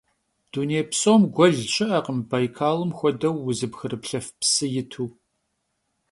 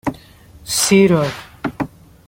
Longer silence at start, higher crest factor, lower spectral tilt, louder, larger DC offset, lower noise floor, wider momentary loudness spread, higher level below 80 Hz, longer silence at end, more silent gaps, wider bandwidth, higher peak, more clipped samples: first, 0.55 s vs 0.05 s; about the same, 20 dB vs 16 dB; about the same, -4.5 dB/octave vs -4.5 dB/octave; second, -23 LUFS vs -16 LUFS; neither; first, -75 dBFS vs -43 dBFS; second, 13 LU vs 16 LU; second, -62 dBFS vs -46 dBFS; first, 1 s vs 0.4 s; neither; second, 11.5 kHz vs 16.5 kHz; about the same, -4 dBFS vs -2 dBFS; neither